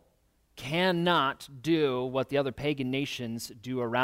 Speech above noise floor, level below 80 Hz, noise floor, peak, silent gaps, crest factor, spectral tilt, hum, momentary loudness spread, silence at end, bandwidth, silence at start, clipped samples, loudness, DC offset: 40 dB; -62 dBFS; -68 dBFS; -12 dBFS; none; 18 dB; -5.5 dB/octave; none; 11 LU; 0 s; 16 kHz; 0.55 s; under 0.1%; -29 LUFS; under 0.1%